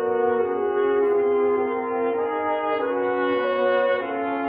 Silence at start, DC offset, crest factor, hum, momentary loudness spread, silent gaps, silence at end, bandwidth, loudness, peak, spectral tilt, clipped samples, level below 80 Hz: 0 s; under 0.1%; 12 dB; none; 4 LU; none; 0 s; 5 kHz; -23 LUFS; -10 dBFS; -8 dB/octave; under 0.1%; -68 dBFS